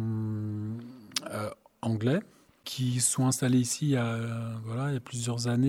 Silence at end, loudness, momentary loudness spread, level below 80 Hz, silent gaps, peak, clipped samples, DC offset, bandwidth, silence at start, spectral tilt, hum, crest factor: 0 s; -30 LUFS; 11 LU; -68 dBFS; none; -6 dBFS; under 0.1%; under 0.1%; 16 kHz; 0 s; -5 dB/octave; none; 24 dB